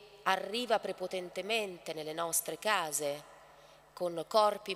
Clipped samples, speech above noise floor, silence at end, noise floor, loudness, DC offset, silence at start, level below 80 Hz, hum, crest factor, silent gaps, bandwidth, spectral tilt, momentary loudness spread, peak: under 0.1%; 25 dB; 0 s; -59 dBFS; -34 LUFS; under 0.1%; 0 s; -76 dBFS; none; 22 dB; none; 16 kHz; -2 dB/octave; 11 LU; -12 dBFS